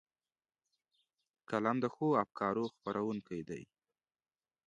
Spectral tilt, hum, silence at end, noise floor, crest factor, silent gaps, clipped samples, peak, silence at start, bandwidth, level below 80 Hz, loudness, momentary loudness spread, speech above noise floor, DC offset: -7.5 dB/octave; none; 1.05 s; under -90 dBFS; 24 dB; none; under 0.1%; -16 dBFS; 1.5 s; 10 kHz; -76 dBFS; -36 LUFS; 11 LU; over 54 dB; under 0.1%